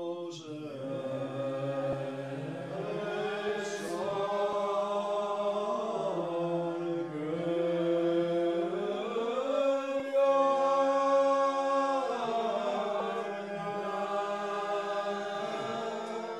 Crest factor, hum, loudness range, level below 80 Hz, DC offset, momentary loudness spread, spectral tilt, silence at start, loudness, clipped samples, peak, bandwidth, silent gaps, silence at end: 16 dB; none; 7 LU; -76 dBFS; under 0.1%; 10 LU; -5.5 dB/octave; 0 s; -32 LUFS; under 0.1%; -16 dBFS; 12 kHz; none; 0 s